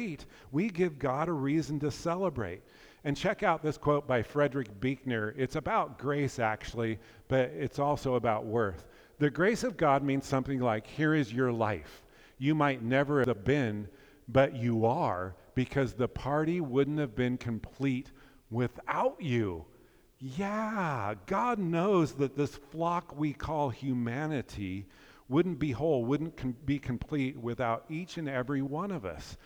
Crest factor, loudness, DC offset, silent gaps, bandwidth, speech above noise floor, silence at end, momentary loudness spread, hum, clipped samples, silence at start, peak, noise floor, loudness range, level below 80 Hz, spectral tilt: 20 dB; -32 LUFS; under 0.1%; none; over 20 kHz; 28 dB; 0.05 s; 9 LU; none; under 0.1%; 0 s; -12 dBFS; -59 dBFS; 4 LU; -56 dBFS; -7 dB/octave